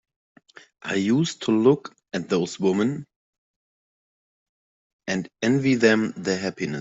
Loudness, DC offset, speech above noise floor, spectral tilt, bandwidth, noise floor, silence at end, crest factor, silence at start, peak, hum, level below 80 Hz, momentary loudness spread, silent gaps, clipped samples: -23 LUFS; under 0.1%; over 68 dB; -5.5 dB/octave; 8 kHz; under -90 dBFS; 0 s; 22 dB; 0.85 s; -4 dBFS; none; -66 dBFS; 13 LU; 3.16-4.99 s; under 0.1%